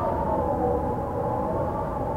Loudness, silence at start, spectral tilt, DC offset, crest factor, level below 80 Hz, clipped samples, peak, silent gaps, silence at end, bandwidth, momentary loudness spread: -27 LUFS; 0 s; -9.5 dB/octave; under 0.1%; 12 dB; -38 dBFS; under 0.1%; -14 dBFS; none; 0 s; 16.5 kHz; 3 LU